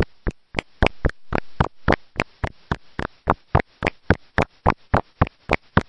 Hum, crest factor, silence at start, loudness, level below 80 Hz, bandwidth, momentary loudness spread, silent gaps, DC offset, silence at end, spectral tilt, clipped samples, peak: none; 22 dB; 0 s; -24 LUFS; -32 dBFS; 10.5 kHz; 9 LU; none; under 0.1%; 0.05 s; -7 dB/octave; under 0.1%; -2 dBFS